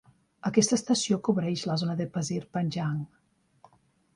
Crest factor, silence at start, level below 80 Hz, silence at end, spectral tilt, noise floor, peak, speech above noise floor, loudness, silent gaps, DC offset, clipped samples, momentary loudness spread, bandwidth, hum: 20 dB; 0.45 s; -66 dBFS; 1.1 s; -5 dB/octave; -64 dBFS; -10 dBFS; 37 dB; -28 LUFS; none; under 0.1%; under 0.1%; 9 LU; 11.5 kHz; none